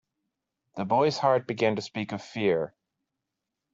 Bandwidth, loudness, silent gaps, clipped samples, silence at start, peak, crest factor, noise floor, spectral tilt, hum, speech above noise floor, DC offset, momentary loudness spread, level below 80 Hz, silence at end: 7.8 kHz; -27 LUFS; none; under 0.1%; 0.75 s; -10 dBFS; 20 dB; -85 dBFS; -6 dB/octave; none; 59 dB; under 0.1%; 13 LU; -70 dBFS; 1.05 s